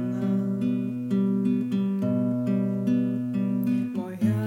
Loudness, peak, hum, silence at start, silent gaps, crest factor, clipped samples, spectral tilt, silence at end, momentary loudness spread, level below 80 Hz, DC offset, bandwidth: -26 LUFS; -12 dBFS; none; 0 s; none; 12 dB; under 0.1%; -9.5 dB/octave; 0 s; 2 LU; -72 dBFS; under 0.1%; 14.5 kHz